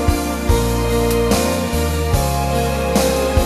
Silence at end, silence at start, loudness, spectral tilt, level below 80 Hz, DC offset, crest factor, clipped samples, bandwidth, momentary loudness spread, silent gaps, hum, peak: 0 s; 0 s; -17 LUFS; -5 dB/octave; -22 dBFS; under 0.1%; 16 dB; under 0.1%; 14 kHz; 3 LU; none; none; -2 dBFS